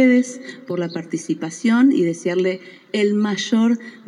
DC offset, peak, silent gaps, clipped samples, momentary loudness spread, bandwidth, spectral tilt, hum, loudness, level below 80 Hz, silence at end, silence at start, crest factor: under 0.1%; -4 dBFS; none; under 0.1%; 12 LU; 11 kHz; -5.5 dB/octave; none; -20 LUFS; -86 dBFS; 0.1 s; 0 s; 14 dB